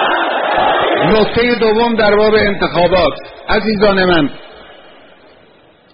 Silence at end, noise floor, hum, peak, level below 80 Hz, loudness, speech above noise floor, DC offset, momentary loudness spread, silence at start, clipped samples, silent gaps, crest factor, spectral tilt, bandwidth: 1.2 s; -46 dBFS; none; 0 dBFS; -34 dBFS; -12 LUFS; 34 dB; under 0.1%; 5 LU; 0 s; under 0.1%; none; 14 dB; -3 dB/octave; 5.4 kHz